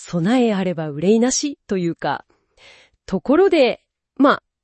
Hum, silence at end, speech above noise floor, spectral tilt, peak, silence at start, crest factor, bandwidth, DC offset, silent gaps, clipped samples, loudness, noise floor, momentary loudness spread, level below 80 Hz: none; 0.3 s; 32 dB; -5 dB/octave; -2 dBFS; 0 s; 16 dB; 8.8 kHz; under 0.1%; none; under 0.1%; -18 LUFS; -50 dBFS; 11 LU; -56 dBFS